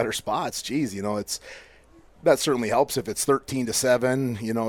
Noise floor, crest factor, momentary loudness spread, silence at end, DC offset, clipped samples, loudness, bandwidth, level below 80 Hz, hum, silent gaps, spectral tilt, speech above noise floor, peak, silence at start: -53 dBFS; 18 dB; 8 LU; 0 s; under 0.1%; under 0.1%; -25 LUFS; 19 kHz; -58 dBFS; none; none; -4 dB/octave; 28 dB; -8 dBFS; 0 s